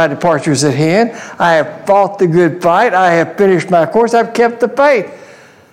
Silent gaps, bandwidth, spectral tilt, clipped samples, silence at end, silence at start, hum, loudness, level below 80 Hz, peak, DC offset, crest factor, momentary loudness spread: none; 15.5 kHz; -5.5 dB/octave; under 0.1%; 0.55 s; 0 s; none; -11 LUFS; -56 dBFS; 0 dBFS; 0.1%; 12 dB; 3 LU